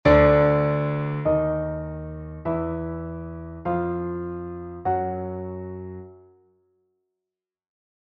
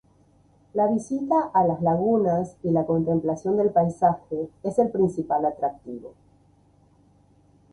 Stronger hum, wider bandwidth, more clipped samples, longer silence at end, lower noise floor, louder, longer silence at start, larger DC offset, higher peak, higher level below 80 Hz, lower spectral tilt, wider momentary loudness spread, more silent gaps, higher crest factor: neither; second, 6.2 kHz vs 11 kHz; neither; first, 1.95 s vs 1.65 s; first, -88 dBFS vs -59 dBFS; about the same, -25 LUFS vs -24 LUFS; second, 0.05 s vs 0.75 s; neither; about the same, -4 dBFS vs -6 dBFS; first, -40 dBFS vs -58 dBFS; about the same, -9.5 dB/octave vs -9.5 dB/octave; first, 17 LU vs 9 LU; neither; about the same, 20 dB vs 18 dB